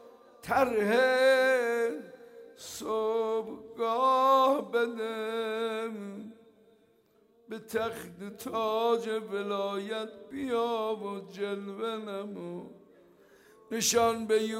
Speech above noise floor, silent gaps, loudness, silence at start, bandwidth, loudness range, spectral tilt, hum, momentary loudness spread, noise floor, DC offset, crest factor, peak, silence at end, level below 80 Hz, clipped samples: 36 dB; none; -29 LUFS; 0 s; 16 kHz; 8 LU; -3 dB/octave; none; 19 LU; -66 dBFS; under 0.1%; 18 dB; -14 dBFS; 0 s; -72 dBFS; under 0.1%